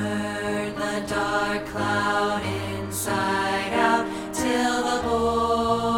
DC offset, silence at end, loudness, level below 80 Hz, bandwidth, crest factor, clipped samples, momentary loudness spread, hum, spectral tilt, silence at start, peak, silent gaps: under 0.1%; 0 s; -24 LUFS; -46 dBFS; 18 kHz; 16 dB; under 0.1%; 6 LU; none; -4 dB/octave; 0 s; -8 dBFS; none